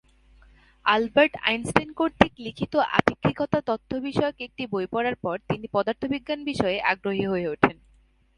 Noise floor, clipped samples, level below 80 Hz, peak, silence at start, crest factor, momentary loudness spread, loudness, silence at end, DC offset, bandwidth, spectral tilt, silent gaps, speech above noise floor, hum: -60 dBFS; under 0.1%; -52 dBFS; 0 dBFS; 0.85 s; 24 dB; 8 LU; -25 LUFS; 0.65 s; under 0.1%; 11.5 kHz; -5.5 dB/octave; none; 35 dB; none